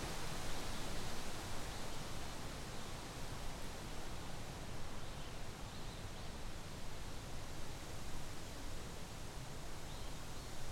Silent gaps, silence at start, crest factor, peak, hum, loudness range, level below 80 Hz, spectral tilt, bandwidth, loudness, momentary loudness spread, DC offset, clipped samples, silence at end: none; 0 s; 14 dB; -28 dBFS; none; 3 LU; -50 dBFS; -4 dB/octave; 16 kHz; -48 LUFS; 5 LU; under 0.1%; under 0.1%; 0 s